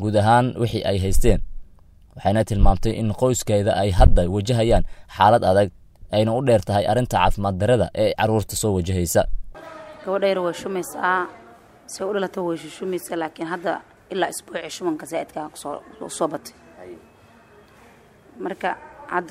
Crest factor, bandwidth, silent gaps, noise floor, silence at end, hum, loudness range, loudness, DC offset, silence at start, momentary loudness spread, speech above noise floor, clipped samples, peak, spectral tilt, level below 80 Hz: 20 dB; 15.5 kHz; none; -51 dBFS; 0 s; none; 11 LU; -22 LUFS; under 0.1%; 0 s; 16 LU; 31 dB; under 0.1%; 0 dBFS; -5.5 dB/octave; -28 dBFS